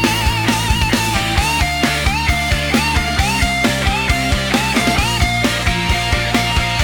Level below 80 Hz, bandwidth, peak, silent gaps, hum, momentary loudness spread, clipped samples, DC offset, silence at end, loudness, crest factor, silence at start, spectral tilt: -24 dBFS; 19 kHz; 0 dBFS; none; none; 1 LU; under 0.1%; under 0.1%; 0 s; -15 LUFS; 16 dB; 0 s; -4 dB/octave